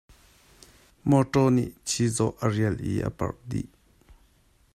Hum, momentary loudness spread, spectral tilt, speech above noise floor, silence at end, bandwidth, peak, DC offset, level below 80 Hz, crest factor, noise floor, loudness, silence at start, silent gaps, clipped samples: none; 12 LU; -6 dB/octave; 37 dB; 1.1 s; 14.5 kHz; -8 dBFS; under 0.1%; -52 dBFS; 20 dB; -62 dBFS; -26 LUFS; 1.05 s; none; under 0.1%